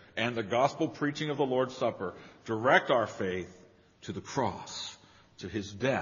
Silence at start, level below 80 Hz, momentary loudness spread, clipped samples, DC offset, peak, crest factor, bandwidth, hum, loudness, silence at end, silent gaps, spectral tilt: 0.15 s; -68 dBFS; 17 LU; under 0.1%; under 0.1%; -8 dBFS; 24 dB; 7.2 kHz; none; -31 LUFS; 0 s; none; -3.5 dB/octave